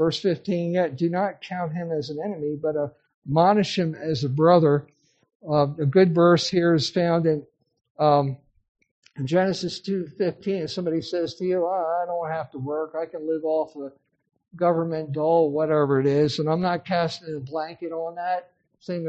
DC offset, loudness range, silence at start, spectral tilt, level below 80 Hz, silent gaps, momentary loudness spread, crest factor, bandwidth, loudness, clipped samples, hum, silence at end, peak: under 0.1%; 6 LU; 0 s; -7 dB/octave; -64 dBFS; 3.14-3.22 s, 5.35-5.40 s, 7.90-7.95 s, 8.68-8.75 s, 8.91-9.03 s; 12 LU; 20 dB; 8.4 kHz; -24 LUFS; under 0.1%; none; 0 s; -4 dBFS